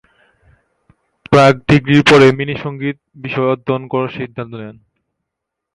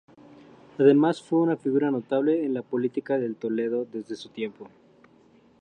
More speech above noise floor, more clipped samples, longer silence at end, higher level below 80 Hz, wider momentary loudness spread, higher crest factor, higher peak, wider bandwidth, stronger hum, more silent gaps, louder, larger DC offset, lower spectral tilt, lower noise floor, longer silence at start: first, 66 dB vs 33 dB; neither; about the same, 1.05 s vs 0.95 s; first, -44 dBFS vs -76 dBFS; first, 19 LU vs 15 LU; about the same, 16 dB vs 20 dB; first, 0 dBFS vs -6 dBFS; first, 11.5 kHz vs 9.6 kHz; neither; neither; first, -13 LUFS vs -25 LUFS; neither; about the same, -6.5 dB/octave vs -7.5 dB/octave; first, -79 dBFS vs -58 dBFS; first, 1.3 s vs 0.8 s